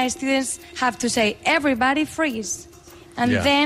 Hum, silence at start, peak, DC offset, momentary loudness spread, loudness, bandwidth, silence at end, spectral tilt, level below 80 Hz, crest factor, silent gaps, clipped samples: none; 0 s; -8 dBFS; under 0.1%; 9 LU; -21 LUFS; 15.5 kHz; 0 s; -3 dB/octave; -50 dBFS; 14 dB; none; under 0.1%